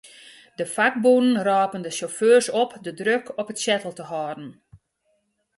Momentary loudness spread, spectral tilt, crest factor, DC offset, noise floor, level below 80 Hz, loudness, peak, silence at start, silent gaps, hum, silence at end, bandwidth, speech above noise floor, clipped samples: 15 LU; -3.5 dB/octave; 18 dB; under 0.1%; -70 dBFS; -70 dBFS; -22 LUFS; -6 dBFS; 0.05 s; none; none; 0.8 s; 11.5 kHz; 49 dB; under 0.1%